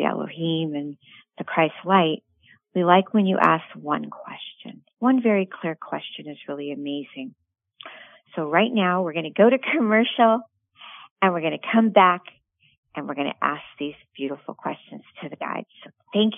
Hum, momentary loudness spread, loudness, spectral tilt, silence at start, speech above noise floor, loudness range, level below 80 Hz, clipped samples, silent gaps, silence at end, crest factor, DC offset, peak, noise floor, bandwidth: none; 20 LU; -22 LUFS; -8.5 dB/octave; 0 s; 24 dB; 9 LU; -78 dBFS; under 0.1%; 11.11-11.16 s, 12.78-12.83 s; 0 s; 24 dB; under 0.1%; 0 dBFS; -46 dBFS; 3.8 kHz